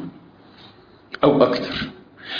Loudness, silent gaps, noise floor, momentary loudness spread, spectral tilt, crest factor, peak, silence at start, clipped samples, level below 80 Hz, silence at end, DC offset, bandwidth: -19 LUFS; none; -48 dBFS; 23 LU; -7 dB/octave; 22 dB; -2 dBFS; 0 s; under 0.1%; -52 dBFS; 0 s; under 0.1%; 5.2 kHz